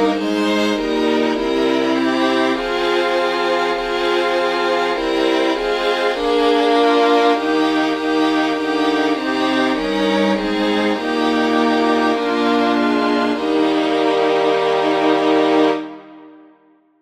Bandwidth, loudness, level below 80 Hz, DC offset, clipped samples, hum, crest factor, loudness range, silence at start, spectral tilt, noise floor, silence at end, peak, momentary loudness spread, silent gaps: 13 kHz; -17 LUFS; -48 dBFS; under 0.1%; under 0.1%; none; 14 dB; 2 LU; 0 s; -4.5 dB/octave; -53 dBFS; 0.7 s; -2 dBFS; 4 LU; none